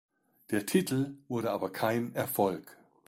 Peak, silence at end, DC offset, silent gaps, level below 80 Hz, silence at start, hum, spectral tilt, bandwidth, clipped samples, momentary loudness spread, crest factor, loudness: -12 dBFS; 0.35 s; under 0.1%; none; -70 dBFS; 0.5 s; none; -5.5 dB/octave; 16.5 kHz; under 0.1%; 6 LU; 20 dB; -32 LUFS